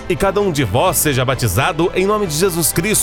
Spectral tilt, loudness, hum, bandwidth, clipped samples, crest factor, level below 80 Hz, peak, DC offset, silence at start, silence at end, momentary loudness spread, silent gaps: -4 dB/octave; -15 LUFS; none; over 20 kHz; under 0.1%; 14 dB; -34 dBFS; 0 dBFS; under 0.1%; 0 s; 0 s; 3 LU; none